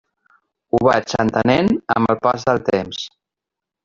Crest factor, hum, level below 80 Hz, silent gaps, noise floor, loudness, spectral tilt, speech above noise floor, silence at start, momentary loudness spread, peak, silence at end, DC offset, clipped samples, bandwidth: 16 dB; none; -50 dBFS; none; -85 dBFS; -18 LUFS; -6 dB/octave; 68 dB; 0.75 s; 9 LU; -2 dBFS; 0.75 s; under 0.1%; under 0.1%; 7.6 kHz